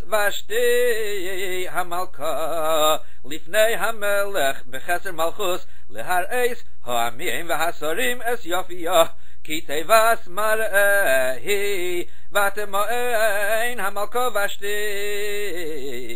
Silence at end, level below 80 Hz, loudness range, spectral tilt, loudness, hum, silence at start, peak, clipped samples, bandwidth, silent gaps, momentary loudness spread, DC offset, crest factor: 0 s; -50 dBFS; 4 LU; -2.5 dB/octave; -23 LUFS; none; 0.05 s; -2 dBFS; under 0.1%; 16 kHz; none; 9 LU; 10%; 22 dB